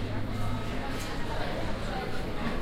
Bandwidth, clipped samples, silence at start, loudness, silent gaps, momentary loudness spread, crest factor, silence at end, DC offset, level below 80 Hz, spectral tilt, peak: 15 kHz; under 0.1%; 0 s; -34 LUFS; none; 1 LU; 12 dB; 0 s; under 0.1%; -36 dBFS; -5.5 dB/octave; -18 dBFS